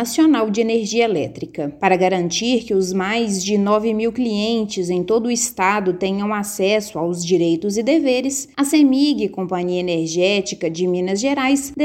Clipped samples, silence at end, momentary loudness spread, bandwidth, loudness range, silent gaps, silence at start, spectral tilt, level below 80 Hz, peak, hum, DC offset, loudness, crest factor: under 0.1%; 0 s; 6 LU; 16.5 kHz; 1 LU; none; 0 s; -4.5 dB/octave; -54 dBFS; 0 dBFS; none; under 0.1%; -18 LUFS; 18 dB